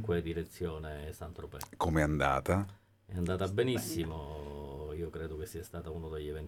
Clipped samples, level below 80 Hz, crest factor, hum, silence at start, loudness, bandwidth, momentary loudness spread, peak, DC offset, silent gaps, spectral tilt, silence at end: under 0.1%; -48 dBFS; 22 dB; none; 0 s; -36 LUFS; 18 kHz; 14 LU; -12 dBFS; under 0.1%; none; -6 dB/octave; 0 s